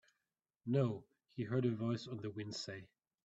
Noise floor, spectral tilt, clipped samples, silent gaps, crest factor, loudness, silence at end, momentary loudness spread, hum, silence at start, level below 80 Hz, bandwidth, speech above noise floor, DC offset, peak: under -90 dBFS; -7 dB/octave; under 0.1%; none; 18 dB; -40 LUFS; 0.4 s; 14 LU; none; 0.65 s; -78 dBFS; 8 kHz; over 51 dB; under 0.1%; -22 dBFS